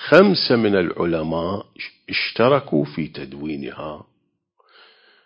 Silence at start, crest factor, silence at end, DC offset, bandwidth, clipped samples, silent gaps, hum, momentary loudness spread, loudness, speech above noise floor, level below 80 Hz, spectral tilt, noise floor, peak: 0 s; 20 dB; 1.25 s; under 0.1%; 8 kHz; under 0.1%; none; none; 18 LU; -20 LUFS; 50 dB; -52 dBFS; -7.5 dB/octave; -69 dBFS; 0 dBFS